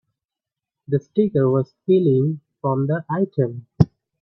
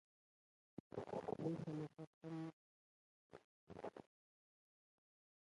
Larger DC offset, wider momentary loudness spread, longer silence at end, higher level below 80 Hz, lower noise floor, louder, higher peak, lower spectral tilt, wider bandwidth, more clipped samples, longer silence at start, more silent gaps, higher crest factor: neither; second, 7 LU vs 21 LU; second, 0.35 s vs 1.4 s; first, -52 dBFS vs -82 dBFS; about the same, -87 dBFS vs under -90 dBFS; first, -21 LUFS vs -50 LUFS; first, 0 dBFS vs -30 dBFS; first, -11 dB/octave vs -8.5 dB/octave; second, 5.8 kHz vs 11 kHz; neither; about the same, 0.9 s vs 0.9 s; second, none vs 2.07-2.21 s, 2.53-3.30 s, 3.44-3.67 s; about the same, 20 dB vs 24 dB